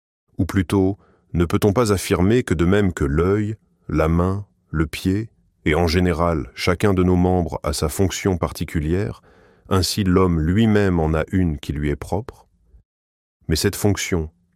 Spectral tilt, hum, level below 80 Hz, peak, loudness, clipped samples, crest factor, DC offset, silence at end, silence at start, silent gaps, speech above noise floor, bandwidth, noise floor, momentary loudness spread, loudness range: -6 dB/octave; none; -34 dBFS; -2 dBFS; -20 LUFS; under 0.1%; 18 dB; under 0.1%; 0.25 s; 0.4 s; 12.85-13.40 s; over 71 dB; 16.5 kHz; under -90 dBFS; 9 LU; 3 LU